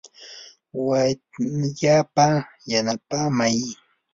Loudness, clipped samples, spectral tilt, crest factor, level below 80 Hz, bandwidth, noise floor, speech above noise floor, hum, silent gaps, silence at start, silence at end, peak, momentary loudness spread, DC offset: -22 LUFS; under 0.1%; -5 dB/octave; 18 dB; -60 dBFS; 7.8 kHz; -44 dBFS; 23 dB; none; none; 0.2 s; 0.4 s; -4 dBFS; 21 LU; under 0.1%